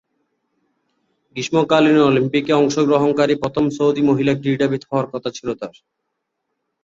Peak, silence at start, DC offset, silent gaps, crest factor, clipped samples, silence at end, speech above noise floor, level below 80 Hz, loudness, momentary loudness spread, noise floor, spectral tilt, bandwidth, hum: -2 dBFS; 1.35 s; under 0.1%; none; 16 dB; under 0.1%; 1.15 s; 59 dB; -56 dBFS; -17 LUFS; 13 LU; -76 dBFS; -6 dB/octave; 7.8 kHz; none